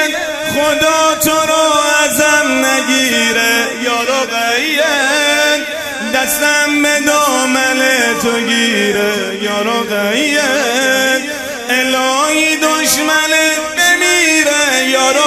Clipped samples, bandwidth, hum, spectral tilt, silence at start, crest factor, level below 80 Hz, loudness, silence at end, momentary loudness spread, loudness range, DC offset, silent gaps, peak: under 0.1%; 16 kHz; none; -1 dB/octave; 0 s; 12 dB; -50 dBFS; -11 LUFS; 0 s; 5 LU; 2 LU; under 0.1%; none; 0 dBFS